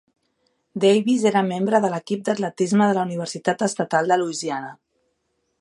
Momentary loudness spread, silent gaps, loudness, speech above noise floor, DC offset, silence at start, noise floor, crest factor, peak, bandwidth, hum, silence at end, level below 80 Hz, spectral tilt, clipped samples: 9 LU; none; -21 LUFS; 52 dB; under 0.1%; 0.75 s; -72 dBFS; 18 dB; -4 dBFS; 11.5 kHz; none; 0.85 s; -72 dBFS; -5 dB/octave; under 0.1%